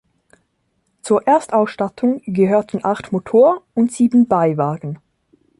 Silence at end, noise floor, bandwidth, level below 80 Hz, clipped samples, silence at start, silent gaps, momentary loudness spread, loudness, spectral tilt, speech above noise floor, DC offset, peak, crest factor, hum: 0.65 s; -67 dBFS; 11.5 kHz; -58 dBFS; under 0.1%; 1.05 s; none; 9 LU; -17 LUFS; -7.5 dB/octave; 51 dB; under 0.1%; -4 dBFS; 14 dB; none